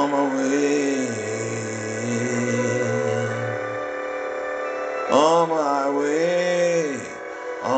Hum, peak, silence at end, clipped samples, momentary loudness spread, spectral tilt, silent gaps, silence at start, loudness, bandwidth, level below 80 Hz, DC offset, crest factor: none; -4 dBFS; 0 s; under 0.1%; 9 LU; -5 dB/octave; none; 0 s; -23 LUFS; 9.2 kHz; -66 dBFS; under 0.1%; 18 dB